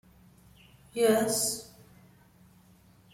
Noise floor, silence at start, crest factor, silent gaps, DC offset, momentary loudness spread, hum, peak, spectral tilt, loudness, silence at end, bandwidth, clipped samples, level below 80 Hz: -59 dBFS; 0.95 s; 20 dB; none; under 0.1%; 16 LU; none; -12 dBFS; -3 dB/octave; -28 LUFS; 1.5 s; 16.5 kHz; under 0.1%; -66 dBFS